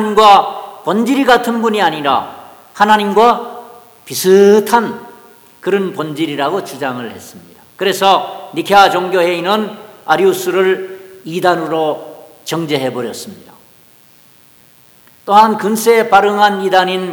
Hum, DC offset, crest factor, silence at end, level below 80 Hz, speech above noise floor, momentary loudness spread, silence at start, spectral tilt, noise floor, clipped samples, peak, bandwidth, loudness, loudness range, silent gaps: none; under 0.1%; 14 dB; 0 s; -54 dBFS; 34 dB; 17 LU; 0 s; -4 dB/octave; -46 dBFS; 0.4%; 0 dBFS; 19.5 kHz; -12 LUFS; 7 LU; none